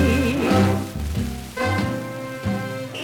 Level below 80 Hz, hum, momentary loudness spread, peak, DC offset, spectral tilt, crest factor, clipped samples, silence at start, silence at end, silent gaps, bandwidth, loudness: -36 dBFS; none; 10 LU; -6 dBFS; under 0.1%; -6 dB/octave; 16 dB; under 0.1%; 0 s; 0 s; none; 19.5 kHz; -23 LUFS